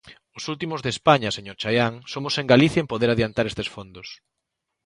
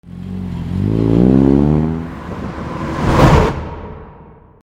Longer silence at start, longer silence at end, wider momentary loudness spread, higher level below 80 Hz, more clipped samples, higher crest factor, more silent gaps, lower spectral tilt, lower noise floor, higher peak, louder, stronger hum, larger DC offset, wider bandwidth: about the same, 0.05 s vs 0.05 s; first, 0.7 s vs 0.35 s; about the same, 18 LU vs 18 LU; second, -52 dBFS vs -26 dBFS; neither; first, 22 dB vs 16 dB; neither; second, -5.5 dB/octave vs -8 dB/octave; first, -81 dBFS vs -40 dBFS; about the same, 0 dBFS vs 0 dBFS; second, -22 LUFS vs -14 LUFS; neither; neither; second, 11.5 kHz vs 16 kHz